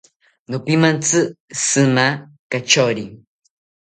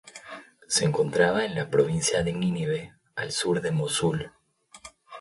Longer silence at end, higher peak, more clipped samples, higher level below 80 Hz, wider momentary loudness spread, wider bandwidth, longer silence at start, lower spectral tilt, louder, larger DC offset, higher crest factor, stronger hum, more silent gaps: first, 0.65 s vs 0 s; first, 0 dBFS vs -8 dBFS; neither; about the same, -60 dBFS vs -56 dBFS; second, 12 LU vs 21 LU; second, 9.6 kHz vs 11.5 kHz; first, 0.5 s vs 0.05 s; about the same, -3.5 dB/octave vs -4 dB/octave; first, -17 LUFS vs -26 LUFS; neither; about the same, 18 dB vs 18 dB; neither; first, 1.40-1.48 s, 2.39-2.50 s vs none